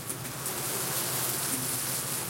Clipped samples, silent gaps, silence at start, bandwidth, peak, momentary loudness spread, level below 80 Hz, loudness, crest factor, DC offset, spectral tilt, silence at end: under 0.1%; none; 0 s; 17 kHz; -14 dBFS; 5 LU; -64 dBFS; -29 LUFS; 20 dB; under 0.1%; -2 dB/octave; 0 s